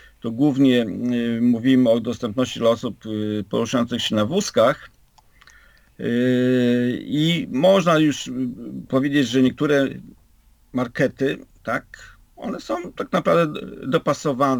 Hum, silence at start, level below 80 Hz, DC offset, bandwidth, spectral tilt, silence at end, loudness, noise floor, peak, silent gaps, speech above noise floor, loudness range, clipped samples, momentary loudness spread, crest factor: none; 0.25 s; -56 dBFS; under 0.1%; 19.5 kHz; -6 dB/octave; 0 s; -21 LUFS; -55 dBFS; -6 dBFS; none; 35 dB; 5 LU; under 0.1%; 11 LU; 16 dB